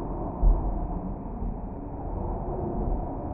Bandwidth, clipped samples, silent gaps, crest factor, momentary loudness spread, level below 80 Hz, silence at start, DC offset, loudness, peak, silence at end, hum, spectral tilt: 2 kHz; under 0.1%; none; 18 dB; 9 LU; -30 dBFS; 0 s; under 0.1%; -32 LUFS; -10 dBFS; 0 s; none; -9.5 dB/octave